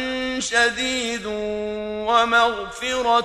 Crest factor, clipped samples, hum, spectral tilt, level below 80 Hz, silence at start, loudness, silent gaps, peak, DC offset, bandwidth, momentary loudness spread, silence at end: 16 dB; under 0.1%; none; -2 dB/octave; -48 dBFS; 0 s; -21 LUFS; none; -6 dBFS; under 0.1%; 13 kHz; 9 LU; 0 s